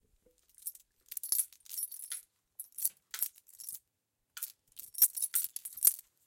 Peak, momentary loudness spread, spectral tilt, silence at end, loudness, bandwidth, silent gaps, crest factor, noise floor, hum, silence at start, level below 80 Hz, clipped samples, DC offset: -8 dBFS; 19 LU; 3.5 dB/octave; 0.25 s; -32 LUFS; 17 kHz; none; 30 dB; -83 dBFS; none; 0.65 s; -84 dBFS; under 0.1%; under 0.1%